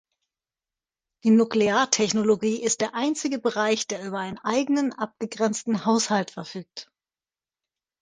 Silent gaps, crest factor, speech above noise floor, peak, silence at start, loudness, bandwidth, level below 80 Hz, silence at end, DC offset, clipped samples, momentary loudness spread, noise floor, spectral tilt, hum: none; 20 dB; over 66 dB; -4 dBFS; 1.25 s; -24 LUFS; 10 kHz; -68 dBFS; 1.2 s; under 0.1%; under 0.1%; 11 LU; under -90 dBFS; -3.5 dB/octave; none